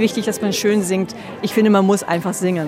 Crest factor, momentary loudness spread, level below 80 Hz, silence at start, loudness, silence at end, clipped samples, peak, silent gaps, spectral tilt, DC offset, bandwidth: 14 dB; 8 LU; -60 dBFS; 0 s; -18 LUFS; 0 s; under 0.1%; -4 dBFS; none; -5 dB/octave; under 0.1%; 16 kHz